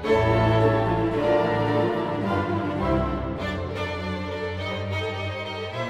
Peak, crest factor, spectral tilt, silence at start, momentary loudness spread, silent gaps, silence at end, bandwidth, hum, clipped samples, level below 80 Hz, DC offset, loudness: -8 dBFS; 16 dB; -7.5 dB/octave; 0 s; 9 LU; none; 0 s; 9.6 kHz; none; under 0.1%; -40 dBFS; under 0.1%; -25 LUFS